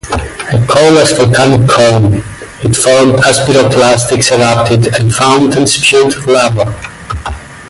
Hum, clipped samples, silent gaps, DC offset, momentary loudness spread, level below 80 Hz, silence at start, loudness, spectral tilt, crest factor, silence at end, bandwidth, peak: none; under 0.1%; none; under 0.1%; 11 LU; -30 dBFS; 0.05 s; -8 LUFS; -4.5 dB/octave; 8 dB; 0 s; 11.5 kHz; 0 dBFS